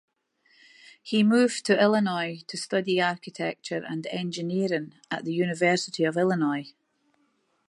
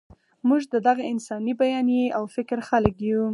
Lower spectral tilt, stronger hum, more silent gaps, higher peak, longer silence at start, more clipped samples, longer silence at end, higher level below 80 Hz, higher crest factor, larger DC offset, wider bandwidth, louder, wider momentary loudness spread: second, -5 dB/octave vs -6.5 dB/octave; neither; neither; second, -8 dBFS vs -2 dBFS; first, 1.05 s vs 0.45 s; neither; first, 1 s vs 0 s; second, -76 dBFS vs -50 dBFS; about the same, 18 dB vs 22 dB; neither; about the same, 11.5 kHz vs 11 kHz; about the same, -26 LUFS vs -24 LUFS; first, 12 LU vs 7 LU